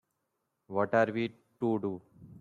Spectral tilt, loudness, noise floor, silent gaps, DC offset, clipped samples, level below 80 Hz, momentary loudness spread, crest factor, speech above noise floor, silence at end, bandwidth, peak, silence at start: -8 dB/octave; -32 LUFS; -82 dBFS; none; under 0.1%; under 0.1%; -74 dBFS; 11 LU; 20 dB; 52 dB; 0 s; 7.4 kHz; -12 dBFS; 0.7 s